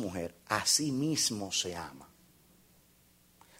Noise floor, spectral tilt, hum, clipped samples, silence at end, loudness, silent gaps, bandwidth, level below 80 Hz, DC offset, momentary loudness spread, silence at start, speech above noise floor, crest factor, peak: -65 dBFS; -2.5 dB/octave; none; under 0.1%; 1.55 s; -31 LUFS; none; 16 kHz; -66 dBFS; under 0.1%; 14 LU; 0 s; 32 dB; 22 dB; -14 dBFS